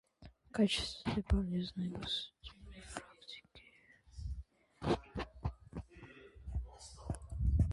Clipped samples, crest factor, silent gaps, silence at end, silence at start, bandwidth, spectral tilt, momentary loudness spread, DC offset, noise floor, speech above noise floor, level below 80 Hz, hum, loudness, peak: under 0.1%; 18 dB; none; 0 s; 0.2 s; 11.5 kHz; -6 dB/octave; 20 LU; under 0.1%; -65 dBFS; 28 dB; -44 dBFS; none; -39 LUFS; -20 dBFS